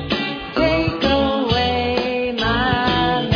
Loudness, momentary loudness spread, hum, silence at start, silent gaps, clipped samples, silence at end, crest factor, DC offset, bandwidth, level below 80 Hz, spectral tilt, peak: -18 LUFS; 4 LU; none; 0 s; none; under 0.1%; 0 s; 14 dB; under 0.1%; 5.4 kHz; -34 dBFS; -6.5 dB/octave; -4 dBFS